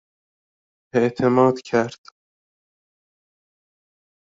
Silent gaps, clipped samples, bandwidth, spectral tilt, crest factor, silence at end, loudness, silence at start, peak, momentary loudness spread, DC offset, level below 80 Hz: none; under 0.1%; 7.8 kHz; -6 dB/octave; 20 dB; 2.35 s; -20 LUFS; 0.95 s; -4 dBFS; 8 LU; under 0.1%; -64 dBFS